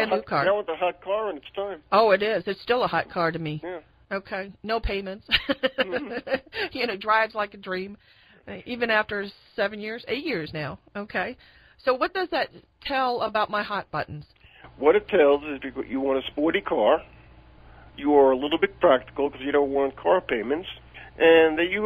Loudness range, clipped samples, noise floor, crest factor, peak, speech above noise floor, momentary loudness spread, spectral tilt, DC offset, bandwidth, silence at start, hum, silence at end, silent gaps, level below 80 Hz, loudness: 6 LU; under 0.1%; -50 dBFS; 20 dB; -4 dBFS; 26 dB; 14 LU; -7 dB/octave; under 0.1%; 13.5 kHz; 0 s; none; 0 s; none; -50 dBFS; -25 LUFS